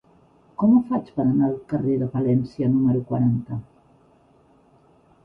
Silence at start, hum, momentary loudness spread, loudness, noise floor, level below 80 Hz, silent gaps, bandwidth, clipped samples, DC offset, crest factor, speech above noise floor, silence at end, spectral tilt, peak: 0.6 s; none; 9 LU; -22 LUFS; -57 dBFS; -56 dBFS; none; 5.4 kHz; under 0.1%; under 0.1%; 16 dB; 36 dB; 1.6 s; -12 dB/octave; -8 dBFS